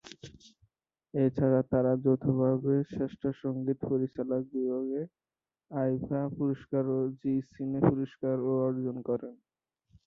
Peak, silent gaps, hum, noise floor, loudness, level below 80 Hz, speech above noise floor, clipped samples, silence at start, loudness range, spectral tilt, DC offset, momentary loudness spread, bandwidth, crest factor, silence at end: -10 dBFS; none; none; -75 dBFS; -31 LUFS; -62 dBFS; 45 dB; under 0.1%; 0.05 s; 4 LU; -10 dB/octave; under 0.1%; 9 LU; 7 kHz; 20 dB; 0.7 s